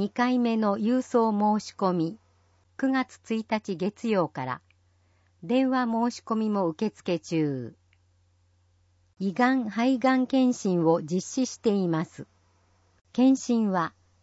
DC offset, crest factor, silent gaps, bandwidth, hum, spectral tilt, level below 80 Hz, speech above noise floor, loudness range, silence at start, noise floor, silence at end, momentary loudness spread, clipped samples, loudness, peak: under 0.1%; 18 dB; none; 8 kHz; none; -6 dB/octave; -72 dBFS; 40 dB; 5 LU; 0 s; -65 dBFS; 0.35 s; 10 LU; under 0.1%; -26 LUFS; -8 dBFS